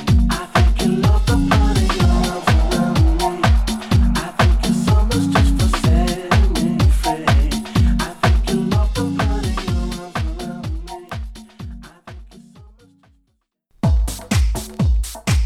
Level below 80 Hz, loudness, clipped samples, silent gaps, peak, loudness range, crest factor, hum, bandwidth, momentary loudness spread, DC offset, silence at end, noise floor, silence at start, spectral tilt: -20 dBFS; -18 LUFS; under 0.1%; none; 0 dBFS; 12 LU; 16 dB; none; 15 kHz; 12 LU; under 0.1%; 0 s; -67 dBFS; 0 s; -6 dB/octave